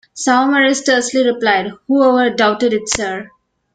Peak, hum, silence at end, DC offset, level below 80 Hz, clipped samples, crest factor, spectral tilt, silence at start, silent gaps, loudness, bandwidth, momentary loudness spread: 0 dBFS; none; 0.5 s; under 0.1%; -52 dBFS; under 0.1%; 14 dB; -2.5 dB/octave; 0.15 s; none; -14 LUFS; 9.4 kHz; 6 LU